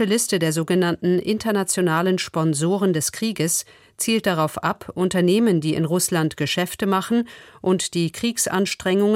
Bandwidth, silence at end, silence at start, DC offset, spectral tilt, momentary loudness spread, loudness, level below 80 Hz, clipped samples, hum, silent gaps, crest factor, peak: 16.5 kHz; 0 s; 0 s; under 0.1%; -4.5 dB/octave; 4 LU; -21 LUFS; -58 dBFS; under 0.1%; none; none; 14 dB; -6 dBFS